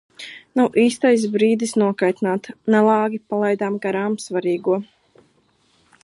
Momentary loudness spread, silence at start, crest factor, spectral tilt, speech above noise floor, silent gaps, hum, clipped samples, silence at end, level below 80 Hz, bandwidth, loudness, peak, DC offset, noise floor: 8 LU; 0.2 s; 16 dB; -5.5 dB/octave; 42 dB; none; none; under 0.1%; 1.2 s; -70 dBFS; 11.5 kHz; -19 LUFS; -4 dBFS; under 0.1%; -61 dBFS